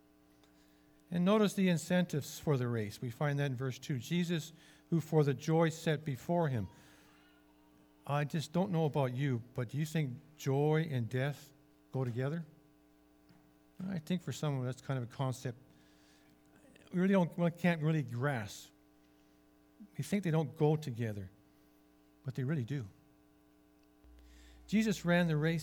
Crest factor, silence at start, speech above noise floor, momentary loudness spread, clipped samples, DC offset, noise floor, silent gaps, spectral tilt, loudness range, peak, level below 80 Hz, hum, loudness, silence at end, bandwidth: 20 dB; 1.1 s; 32 dB; 13 LU; under 0.1%; under 0.1%; -66 dBFS; none; -6.5 dB/octave; 6 LU; -16 dBFS; -70 dBFS; none; -35 LUFS; 0 s; 18.5 kHz